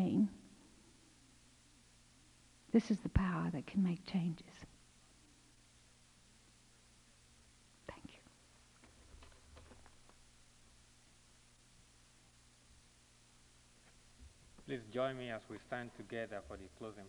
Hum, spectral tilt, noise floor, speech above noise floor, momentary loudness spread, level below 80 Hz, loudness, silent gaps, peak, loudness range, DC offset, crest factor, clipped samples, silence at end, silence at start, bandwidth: 60 Hz at -70 dBFS; -7 dB/octave; -67 dBFS; 27 dB; 29 LU; -58 dBFS; -40 LUFS; none; -18 dBFS; 26 LU; under 0.1%; 26 dB; under 0.1%; 0 s; 0 s; 11.5 kHz